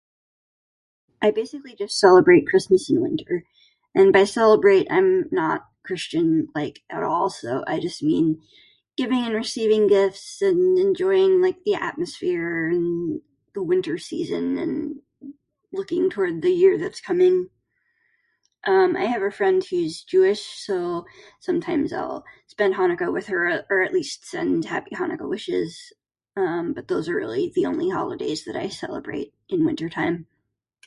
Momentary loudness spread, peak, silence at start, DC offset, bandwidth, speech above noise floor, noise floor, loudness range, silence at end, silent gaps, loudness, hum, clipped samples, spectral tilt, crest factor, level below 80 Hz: 14 LU; -2 dBFS; 1.2 s; under 0.1%; 11.5 kHz; 55 dB; -76 dBFS; 7 LU; 0.65 s; none; -22 LUFS; none; under 0.1%; -5.5 dB/octave; 20 dB; -62 dBFS